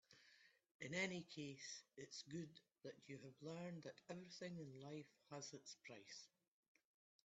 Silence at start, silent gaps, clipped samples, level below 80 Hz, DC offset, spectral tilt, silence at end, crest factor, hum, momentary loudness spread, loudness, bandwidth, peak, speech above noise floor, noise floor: 0.1 s; 0.71-0.79 s; under 0.1%; under -90 dBFS; under 0.1%; -4 dB/octave; 1 s; 24 dB; none; 13 LU; -54 LUFS; 8.2 kHz; -32 dBFS; 20 dB; -74 dBFS